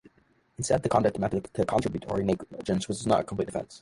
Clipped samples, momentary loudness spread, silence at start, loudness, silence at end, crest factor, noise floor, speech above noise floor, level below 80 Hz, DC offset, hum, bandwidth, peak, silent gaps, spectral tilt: under 0.1%; 7 LU; 0.6 s; -28 LUFS; 0 s; 20 dB; -64 dBFS; 37 dB; -52 dBFS; under 0.1%; none; 11.5 kHz; -8 dBFS; none; -6 dB/octave